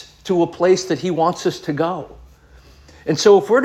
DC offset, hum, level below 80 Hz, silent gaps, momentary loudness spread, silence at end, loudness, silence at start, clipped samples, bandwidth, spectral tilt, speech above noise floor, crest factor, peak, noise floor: under 0.1%; none; -50 dBFS; none; 13 LU; 0 s; -18 LUFS; 0 s; under 0.1%; 13 kHz; -5 dB/octave; 30 dB; 16 dB; -2 dBFS; -47 dBFS